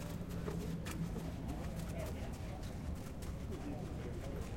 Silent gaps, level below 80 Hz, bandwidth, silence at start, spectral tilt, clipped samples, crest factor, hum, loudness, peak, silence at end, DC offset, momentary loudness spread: none; -48 dBFS; 16.5 kHz; 0 s; -6.5 dB/octave; under 0.1%; 14 dB; none; -44 LUFS; -28 dBFS; 0 s; under 0.1%; 3 LU